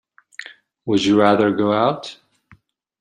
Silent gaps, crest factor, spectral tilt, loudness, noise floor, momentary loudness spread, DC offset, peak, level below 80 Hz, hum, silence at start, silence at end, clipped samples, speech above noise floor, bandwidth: none; 18 dB; -6 dB/octave; -17 LUFS; -54 dBFS; 22 LU; under 0.1%; -2 dBFS; -60 dBFS; none; 0.4 s; 0.85 s; under 0.1%; 38 dB; 10 kHz